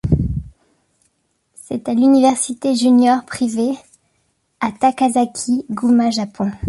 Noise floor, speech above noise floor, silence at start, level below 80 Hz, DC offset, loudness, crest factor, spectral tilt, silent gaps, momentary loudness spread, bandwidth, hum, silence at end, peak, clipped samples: -66 dBFS; 50 dB; 0.05 s; -36 dBFS; under 0.1%; -17 LUFS; 14 dB; -5.5 dB/octave; none; 12 LU; 11.5 kHz; none; 0 s; -4 dBFS; under 0.1%